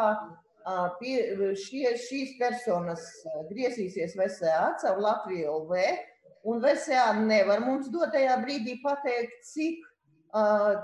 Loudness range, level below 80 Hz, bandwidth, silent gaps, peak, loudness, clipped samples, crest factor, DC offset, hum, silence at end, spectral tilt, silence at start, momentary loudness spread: 5 LU; -76 dBFS; 11.5 kHz; none; -12 dBFS; -29 LUFS; under 0.1%; 16 dB; under 0.1%; none; 0 s; -5 dB/octave; 0 s; 12 LU